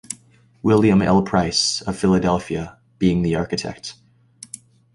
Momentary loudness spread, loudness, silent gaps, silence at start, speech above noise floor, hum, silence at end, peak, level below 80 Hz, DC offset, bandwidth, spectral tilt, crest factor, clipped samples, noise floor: 20 LU; -19 LUFS; none; 0.1 s; 34 dB; none; 1.05 s; -2 dBFS; -42 dBFS; under 0.1%; 11.5 kHz; -5 dB/octave; 18 dB; under 0.1%; -52 dBFS